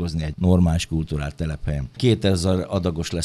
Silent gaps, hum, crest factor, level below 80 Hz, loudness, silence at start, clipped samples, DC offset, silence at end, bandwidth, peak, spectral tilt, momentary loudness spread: none; none; 18 dB; -34 dBFS; -22 LUFS; 0 s; under 0.1%; under 0.1%; 0 s; 12.5 kHz; -4 dBFS; -6.5 dB/octave; 9 LU